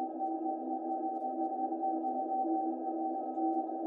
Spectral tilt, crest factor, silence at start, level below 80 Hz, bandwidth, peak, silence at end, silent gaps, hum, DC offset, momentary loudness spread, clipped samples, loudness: -9.5 dB/octave; 12 dB; 0 s; -88 dBFS; 1.8 kHz; -22 dBFS; 0 s; none; none; under 0.1%; 3 LU; under 0.1%; -35 LUFS